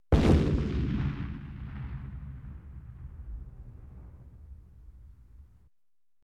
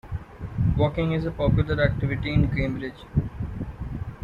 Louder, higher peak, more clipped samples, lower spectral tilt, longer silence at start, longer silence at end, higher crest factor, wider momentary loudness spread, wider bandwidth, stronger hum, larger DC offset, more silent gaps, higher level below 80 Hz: second, -30 LUFS vs -26 LUFS; about the same, -8 dBFS vs -8 dBFS; neither; about the same, -8 dB/octave vs -9 dB/octave; about the same, 0.1 s vs 0.05 s; first, 0.9 s vs 0 s; first, 24 dB vs 18 dB; first, 27 LU vs 12 LU; first, 10.5 kHz vs 5.4 kHz; neither; neither; neither; about the same, -36 dBFS vs -36 dBFS